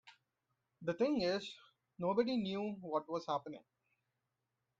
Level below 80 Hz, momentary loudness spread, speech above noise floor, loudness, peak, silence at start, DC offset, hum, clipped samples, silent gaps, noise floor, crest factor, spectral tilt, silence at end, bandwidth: -76 dBFS; 16 LU; 50 dB; -38 LUFS; -22 dBFS; 0.05 s; under 0.1%; none; under 0.1%; none; -88 dBFS; 18 dB; -6 dB/octave; 1.2 s; 7.8 kHz